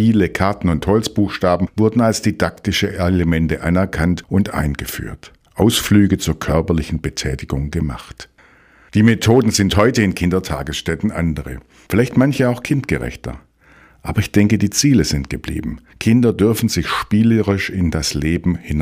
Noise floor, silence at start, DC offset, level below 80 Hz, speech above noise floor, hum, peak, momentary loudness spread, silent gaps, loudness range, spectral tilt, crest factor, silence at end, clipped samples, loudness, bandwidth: -49 dBFS; 0 s; under 0.1%; -32 dBFS; 33 dB; none; 0 dBFS; 11 LU; none; 3 LU; -5.5 dB/octave; 16 dB; 0 s; under 0.1%; -17 LUFS; 16 kHz